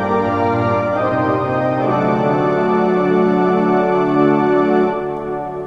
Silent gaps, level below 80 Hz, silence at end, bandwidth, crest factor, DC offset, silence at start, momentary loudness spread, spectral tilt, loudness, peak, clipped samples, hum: none; -48 dBFS; 0 s; 7.2 kHz; 14 dB; under 0.1%; 0 s; 3 LU; -8.5 dB/octave; -16 LUFS; -2 dBFS; under 0.1%; none